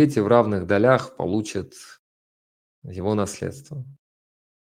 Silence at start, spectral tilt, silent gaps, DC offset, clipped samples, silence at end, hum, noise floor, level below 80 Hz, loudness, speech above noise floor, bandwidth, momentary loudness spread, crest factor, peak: 0 s; -6.5 dB/octave; 1.99-2.82 s; under 0.1%; under 0.1%; 0.7 s; none; under -90 dBFS; -58 dBFS; -22 LUFS; over 68 dB; 15.5 kHz; 20 LU; 22 dB; -2 dBFS